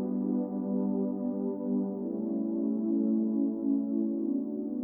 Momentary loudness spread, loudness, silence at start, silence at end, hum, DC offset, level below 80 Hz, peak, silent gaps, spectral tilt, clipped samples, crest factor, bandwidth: 5 LU; -31 LUFS; 0 s; 0 s; none; under 0.1%; -74 dBFS; -20 dBFS; none; -15 dB/octave; under 0.1%; 12 dB; 1.6 kHz